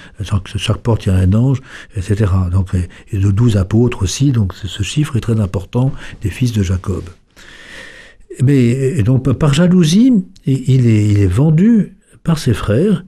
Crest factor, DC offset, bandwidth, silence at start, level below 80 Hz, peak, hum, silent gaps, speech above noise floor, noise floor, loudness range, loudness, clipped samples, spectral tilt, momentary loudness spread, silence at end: 12 dB; under 0.1%; 13 kHz; 0 s; -34 dBFS; -2 dBFS; none; none; 25 dB; -38 dBFS; 6 LU; -14 LUFS; under 0.1%; -7 dB/octave; 12 LU; 0 s